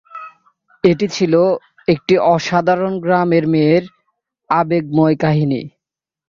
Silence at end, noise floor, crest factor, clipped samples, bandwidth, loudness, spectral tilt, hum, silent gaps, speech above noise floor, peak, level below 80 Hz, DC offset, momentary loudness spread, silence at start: 0.6 s; -85 dBFS; 14 dB; under 0.1%; 7.4 kHz; -15 LUFS; -7 dB/octave; none; none; 71 dB; -2 dBFS; -54 dBFS; under 0.1%; 7 LU; 0.15 s